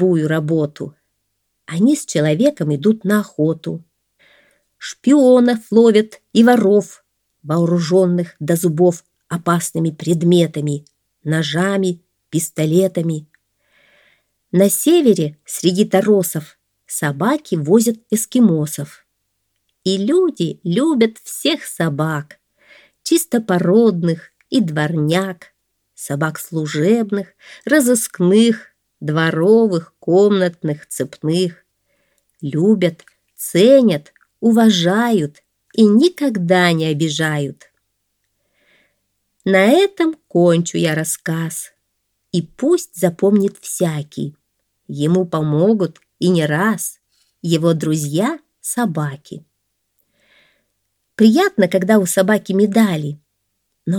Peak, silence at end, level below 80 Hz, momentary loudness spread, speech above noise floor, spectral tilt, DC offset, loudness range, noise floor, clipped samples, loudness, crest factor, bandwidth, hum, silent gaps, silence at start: 0 dBFS; 0 s; -66 dBFS; 14 LU; 56 dB; -5.5 dB/octave; under 0.1%; 5 LU; -71 dBFS; under 0.1%; -16 LUFS; 16 dB; 19 kHz; none; none; 0 s